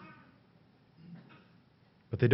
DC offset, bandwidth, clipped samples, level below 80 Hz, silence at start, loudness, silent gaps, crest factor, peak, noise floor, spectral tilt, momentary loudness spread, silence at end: under 0.1%; 5.8 kHz; under 0.1%; -70 dBFS; 0 s; -39 LUFS; none; 26 dB; -12 dBFS; -65 dBFS; -7.5 dB/octave; 23 LU; 0 s